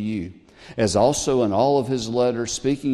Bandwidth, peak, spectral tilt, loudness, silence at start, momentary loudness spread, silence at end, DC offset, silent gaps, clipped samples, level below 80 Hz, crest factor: 12.5 kHz; -6 dBFS; -5 dB/octave; -21 LUFS; 0 s; 11 LU; 0 s; under 0.1%; none; under 0.1%; -48 dBFS; 16 dB